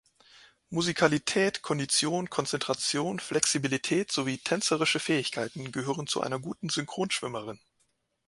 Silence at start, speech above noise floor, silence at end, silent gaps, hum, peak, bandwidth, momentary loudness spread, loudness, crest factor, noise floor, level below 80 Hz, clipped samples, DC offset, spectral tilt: 0.7 s; 45 dB; 0.7 s; none; none; -6 dBFS; 11.5 kHz; 9 LU; -29 LUFS; 24 dB; -74 dBFS; -68 dBFS; under 0.1%; under 0.1%; -3 dB/octave